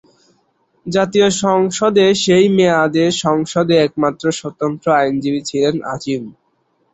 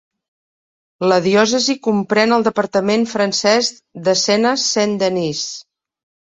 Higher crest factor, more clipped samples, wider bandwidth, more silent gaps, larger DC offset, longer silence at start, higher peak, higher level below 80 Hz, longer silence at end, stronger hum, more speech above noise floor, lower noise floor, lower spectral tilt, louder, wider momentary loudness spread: about the same, 14 dB vs 16 dB; neither; about the same, 8.2 kHz vs 8.4 kHz; neither; neither; second, 0.85 s vs 1 s; about the same, -2 dBFS vs -2 dBFS; first, -54 dBFS vs -60 dBFS; about the same, 0.6 s vs 0.6 s; neither; second, 48 dB vs over 74 dB; second, -62 dBFS vs under -90 dBFS; first, -5 dB/octave vs -3.5 dB/octave; about the same, -15 LUFS vs -16 LUFS; about the same, 10 LU vs 8 LU